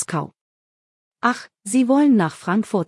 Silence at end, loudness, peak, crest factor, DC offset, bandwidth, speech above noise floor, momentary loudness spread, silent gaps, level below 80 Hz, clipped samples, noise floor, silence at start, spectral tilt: 0.05 s; -20 LUFS; -4 dBFS; 16 dB; under 0.1%; 12 kHz; over 71 dB; 13 LU; 0.41-1.11 s; -70 dBFS; under 0.1%; under -90 dBFS; 0 s; -5.5 dB/octave